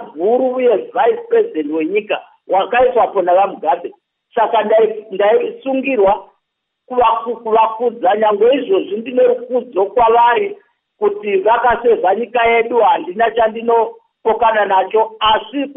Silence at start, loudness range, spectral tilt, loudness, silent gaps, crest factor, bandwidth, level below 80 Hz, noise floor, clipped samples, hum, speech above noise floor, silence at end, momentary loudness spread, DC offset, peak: 0 s; 2 LU; -1.5 dB/octave; -15 LUFS; none; 12 dB; 3.8 kHz; -50 dBFS; -74 dBFS; under 0.1%; none; 60 dB; 0.05 s; 7 LU; under 0.1%; -2 dBFS